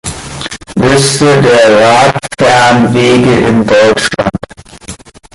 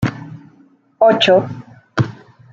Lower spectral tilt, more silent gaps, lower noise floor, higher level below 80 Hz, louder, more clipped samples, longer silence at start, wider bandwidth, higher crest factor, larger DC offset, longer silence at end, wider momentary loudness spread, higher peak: second, -4.5 dB/octave vs -6 dB/octave; neither; second, -29 dBFS vs -51 dBFS; first, -36 dBFS vs -50 dBFS; first, -7 LUFS vs -15 LUFS; neither; about the same, 0.05 s vs 0 s; first, 11.5 kHz vs 7.6 kHz; second, 8 dB vs 16 dB; neither; about the same, 0.4 s vs 0.4 s; second, 16 LU vs 23 LU; about the same, 0 dBFS vs -2 dBFS